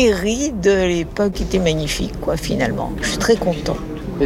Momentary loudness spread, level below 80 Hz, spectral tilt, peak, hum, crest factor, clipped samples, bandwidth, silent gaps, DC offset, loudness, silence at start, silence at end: 7 LU; -30 dBFS; -5 dB/octave; -4 dBFS; none; 14 dB; under 0.1%; 16.5 kHz; none; under 0.1%; -19 LUFS; 0 s; 0 s